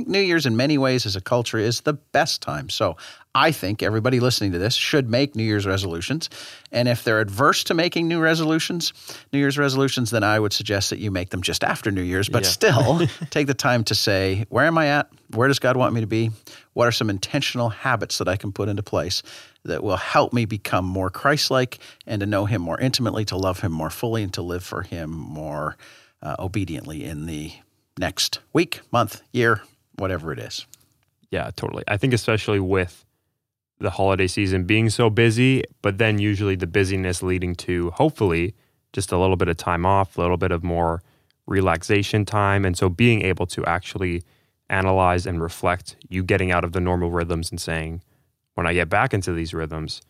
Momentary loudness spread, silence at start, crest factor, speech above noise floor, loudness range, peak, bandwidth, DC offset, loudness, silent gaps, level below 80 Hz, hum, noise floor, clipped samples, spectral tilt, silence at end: 11 LU; 0 s; 18 dB; 57 dB; 5 LU; -4 dBFS; 15.5 kHz; under 0.1%; -22 LUFS; none; -50 dBFS; none; -79 dBFS; under 0.1%; -5 dB/octave; 0.1 s